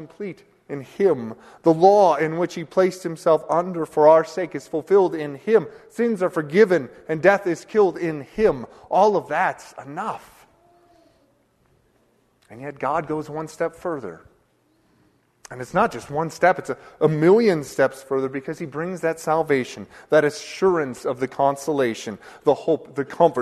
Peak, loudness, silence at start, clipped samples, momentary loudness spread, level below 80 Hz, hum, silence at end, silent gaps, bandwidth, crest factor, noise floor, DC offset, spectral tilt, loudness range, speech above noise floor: -2 dBFS; -21 LUFS; 0 s; under 0.1%; 16 LU; -58 dBFS; none; 0 s; none; 13.5 kHz; 20 dB; -63 dBFS; under 0.1%; -6 dB/octave; 10 LU; 42 dB